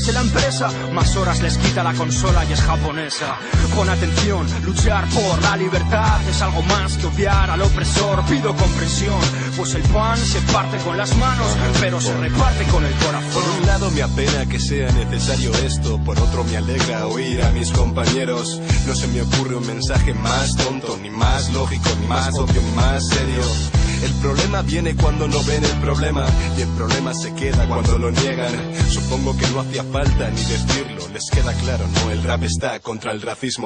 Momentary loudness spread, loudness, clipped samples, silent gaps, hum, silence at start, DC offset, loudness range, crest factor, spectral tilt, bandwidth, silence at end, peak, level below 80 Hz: 4 LU; -19 LUFS; under 0.1%; none; none; 0 s; under 0.1%; 2 LU; 14 dB; -5 dB/octave; 10 kHz; 0 s; -4 dBFS; -24 dBFS